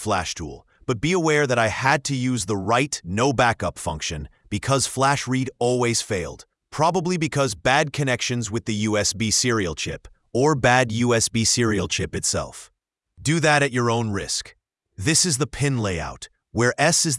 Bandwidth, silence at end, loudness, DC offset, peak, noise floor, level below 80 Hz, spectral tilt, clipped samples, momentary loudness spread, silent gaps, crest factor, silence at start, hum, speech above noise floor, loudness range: 12 kHz; 0 s; -22 LUFS; under 0.1%; -2 dBFS; -54 dBFS; -48 dBFS; -3.5 dB/octave; under 0.1%; 11 LU; none; 20 dB; 0 s; none; 32 dB; 2 LU